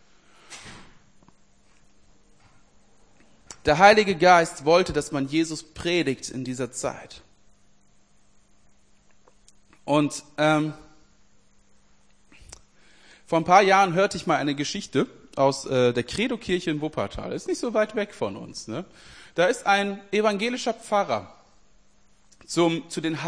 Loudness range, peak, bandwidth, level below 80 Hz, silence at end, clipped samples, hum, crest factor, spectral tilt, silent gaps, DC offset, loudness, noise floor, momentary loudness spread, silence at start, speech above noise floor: 10 LU; -2 dBFS; 10.5 kHz; -54 dBFS; 0 s; under 0.1%; none; 24 dB; -4.5 dB/octave; none; 0.1%; -23 LUFS; -62 dBFS; 17 LU; 0.5 s; 39 dB